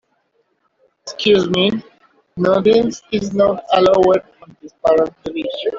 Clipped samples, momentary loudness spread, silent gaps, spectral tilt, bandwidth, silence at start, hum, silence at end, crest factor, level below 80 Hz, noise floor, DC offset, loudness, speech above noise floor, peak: under 0.1%; 12 LU; none; -5.5 dB/octave; 7.6 kHz; 1.05 s; none; 0 s; 14 dB; -52 dBFS; -64 dBFS; under 0.1%; -16 LUFS; 49 dB; -2 dBFS